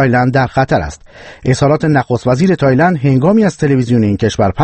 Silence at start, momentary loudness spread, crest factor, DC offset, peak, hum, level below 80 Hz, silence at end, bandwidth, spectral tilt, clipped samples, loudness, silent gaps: 0 s; 4 LU; 12 dB; under 0.1%; 0 dBFS; none; -36 dBFS; 0 s; 8.8 kHz; -7 dB/octave; under 0.1%; -12 LUFS; none